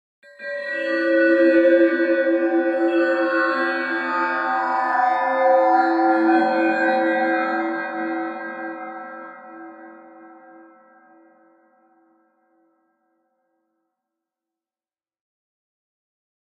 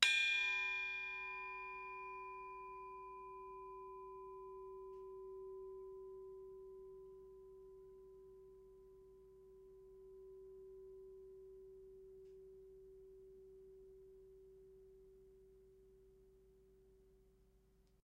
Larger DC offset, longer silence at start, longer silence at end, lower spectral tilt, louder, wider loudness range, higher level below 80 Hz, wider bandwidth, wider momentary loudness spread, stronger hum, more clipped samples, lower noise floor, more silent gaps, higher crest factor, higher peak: neither; first, 0.4 s vs 0 s; first, 6.2 s vs 0.15 s; first, -5.5 dB/octave vs -0.5 dB/octave; first, -19 LUFS vs -44 LUFS; about the same, 15 LU vs 17 LU; second, -80 dBFS vs -74 dBFS; second, 5.6 kHz vs 8.4 kHz; second, 17 LU vs 21 LU; second, none vs 50 Hz at -75 dBFS; neither; first, under -90 dBFS vs -72 dBFS; neither; second, 16 dB vs 36 dB; first, -6 dBFS vs -14 dBFS